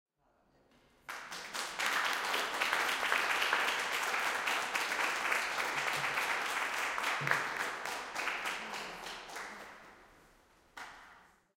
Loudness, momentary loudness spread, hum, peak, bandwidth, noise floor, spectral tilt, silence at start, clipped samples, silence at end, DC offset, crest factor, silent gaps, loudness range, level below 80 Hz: -34 LUFS; 15 LU; none; -14 dBFS; 17 kHz; -72 dBFS; -0.5 dB/octave; 1.1 s; under 0.1%; 0.35 s; under 0.1%; 24 dB; none; 9 LU; -72 dBFS